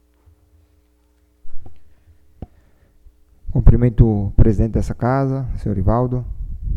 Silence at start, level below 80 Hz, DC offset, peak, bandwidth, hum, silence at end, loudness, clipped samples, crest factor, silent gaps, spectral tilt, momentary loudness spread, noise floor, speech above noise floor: 1.45 s; -22 dBFS; under 0.1%; 0 dBFS; 7.2 kHz; none; 0 s; -18 LUFS; 0.2%; 18 dB; none; -10.5 dB/octave; 21 LU; -58 dBFS; 43 dB